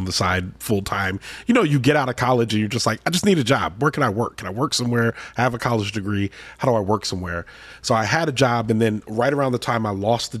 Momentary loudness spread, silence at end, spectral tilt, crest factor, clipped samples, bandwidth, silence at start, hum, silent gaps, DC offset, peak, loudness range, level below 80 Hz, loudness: 7 LU; 0 s; -5 dB/octave; 16 dB; under 0.1%; 14.5 kHz; 0 s; none; none; under 0.1%; -6 dBFS; 3 LU; -50 dBFS; -21 LUFS